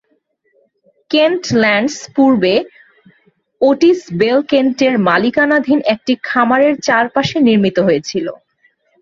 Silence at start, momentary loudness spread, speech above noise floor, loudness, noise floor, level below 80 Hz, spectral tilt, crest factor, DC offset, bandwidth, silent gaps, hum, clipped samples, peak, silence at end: 1.1 s; 6 LU; 49 dB; -13 LUFS; -62 dBFS; -56 dBFS; -5 dB/octave; 14 dB; under 0.1%; 7.6 kHz; none; none; under 0.1%; 0 dBFS; 0.65 s